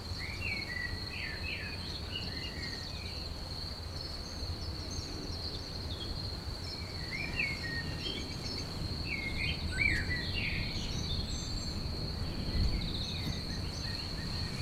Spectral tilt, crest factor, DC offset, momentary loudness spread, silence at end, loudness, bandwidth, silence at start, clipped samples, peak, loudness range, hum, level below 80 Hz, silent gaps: -4 dB/octave; 20 dB; under 0.1%; 6 LU; 0 s; -37 LUFS; 16 kHz; 0 s; under 0.1%; -18 dBFS; 5 LU; none; -42 dBFS; none